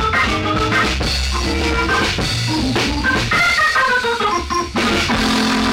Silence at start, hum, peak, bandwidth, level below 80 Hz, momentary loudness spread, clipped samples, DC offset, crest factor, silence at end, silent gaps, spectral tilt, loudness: 0 s; none; -6 dBFS; 16.5 kHz; -28 dBFS; 5 LU; under 0.1%; under 0.1%; 10 dB; 0 s; none; -4 dB/octave; -16 LUFS